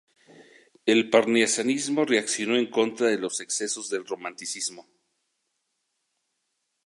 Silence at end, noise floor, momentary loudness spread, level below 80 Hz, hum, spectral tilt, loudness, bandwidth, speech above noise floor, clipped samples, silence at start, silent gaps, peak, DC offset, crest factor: 2.05 s; -78 dBFS; 11 LU; -80 dBFS; none; -2.5 dB/octave; -25 LUFS; 11.5 kHz; 53 dB; under 0.1%; 0.85 s; none; -6 dBFS; under 0.1%; 22 dB